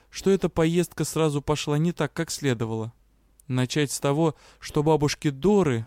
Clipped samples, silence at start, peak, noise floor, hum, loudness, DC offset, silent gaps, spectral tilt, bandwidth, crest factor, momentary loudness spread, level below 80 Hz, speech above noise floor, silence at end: under 0.1%; 0.15 s; -10 dBFS; -60 dBFS; none; -25 LUFS; under 0.1%; none; -5.5 dB/octave; 16.5 kHz; 14 dB; 8 LU; -50 dBFS; 36 dB; 0 s